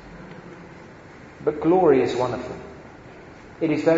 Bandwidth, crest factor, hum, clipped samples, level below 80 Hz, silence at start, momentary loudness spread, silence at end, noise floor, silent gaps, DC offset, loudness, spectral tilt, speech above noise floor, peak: 7.8 kHz; 18 dB; none; under 0.1%; -54 dBFS; 0.05 s; 26 LU; 0 s; -44 dBFS; none; under 0.1%; -22 LUFS; -7 dB/octave; 24 dB; -6 dBFS